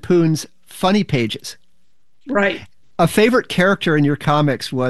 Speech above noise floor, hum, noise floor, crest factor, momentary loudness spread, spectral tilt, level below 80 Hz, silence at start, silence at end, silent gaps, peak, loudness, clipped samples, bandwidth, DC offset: 52 dB; none; -68 dBFS; 16 dB; 14 LU; -6 dB/octave; -50 dBFS; 0.05 s; 0 s; none; -2 dBFS; -17 LUFS; under 0.1%; 12.5 kHz; 1%